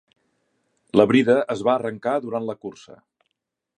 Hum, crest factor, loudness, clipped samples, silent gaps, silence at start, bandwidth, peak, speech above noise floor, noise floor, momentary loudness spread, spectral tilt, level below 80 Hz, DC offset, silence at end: none; 22 dB; -21 LUFS; under 0.1%; none; 0.95 s; 9.8 kHz; -2 dBFS; 60 dB; -81 dBFS; 15 LU; -6.5 dB/octave; -64 dBFS; under 0.1%; 1.05 s